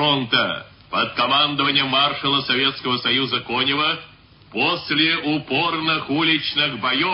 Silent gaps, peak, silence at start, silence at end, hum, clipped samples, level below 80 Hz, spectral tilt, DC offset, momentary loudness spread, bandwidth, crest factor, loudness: none; -4 dBFS; 0 s; 0 s; none; under 0.1%; -58 dBFS; -9 dB/octave; under 0.1%; 5 LU; 5.8 kHz; 18 dB; -19 LUFS